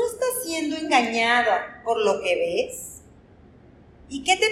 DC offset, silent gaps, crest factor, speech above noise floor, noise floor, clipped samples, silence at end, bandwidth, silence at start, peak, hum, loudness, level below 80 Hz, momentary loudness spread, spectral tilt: under 0.1%; none; 20 dB; 28 dB; -51 dBFS; under 0.1%; 0 s; 16 kHz; 0 s; -6 dBFS; none; -23 LUFS; -58 dBFS; 11 LU; -2 dB/octave